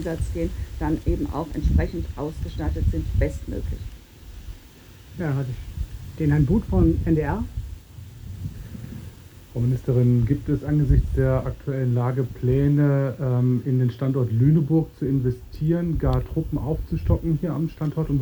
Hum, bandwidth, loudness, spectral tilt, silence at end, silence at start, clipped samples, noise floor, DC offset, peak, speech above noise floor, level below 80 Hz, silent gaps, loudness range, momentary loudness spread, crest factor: none; over 20 kHz; -23 LUFS; -9.5 dB/octave; 0 s; 0 s; under 0.1%; -46 dBFS; under 0.1%; -6 dBFS; 24 dB; -32 dBFS; none; 7 LU; 16 LU; 16 dB